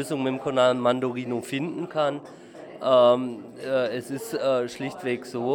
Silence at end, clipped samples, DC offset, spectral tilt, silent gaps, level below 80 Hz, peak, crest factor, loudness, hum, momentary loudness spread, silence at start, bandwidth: 0 s; under 0.1%; under 0.1%; -5.5 dB/octave; none; -72 dBFS; -6 dBFS; 18 dB; -25 LUFS; none; 14 LU; 0 s; 17.5 kHz